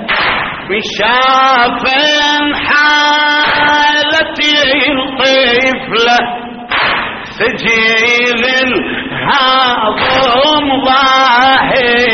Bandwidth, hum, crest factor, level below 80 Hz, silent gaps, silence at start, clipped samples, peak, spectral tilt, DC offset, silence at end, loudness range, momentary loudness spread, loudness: 7.2 kHz; none; 10 dB; -40 dBFS; none; 0 s; under 0.1%; 0 dBFS; 0.5 dB/octave; under 0.1%; 0 s; 2 LU; 7 LU; -9 LUFS